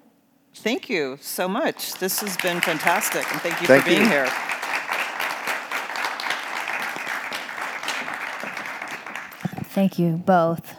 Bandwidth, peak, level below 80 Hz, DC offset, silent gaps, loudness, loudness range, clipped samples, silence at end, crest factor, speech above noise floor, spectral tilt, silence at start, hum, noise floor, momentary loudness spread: over 20 kHz; 0 dBFS; -72 dBFS; under 0.1%; none; -23 LUFS; 7 LU; under 0.1%; 0 s; 24 dB; 38 dB; -4 dB/octave; 0.55 s; none; -59 dBFS; 13 LU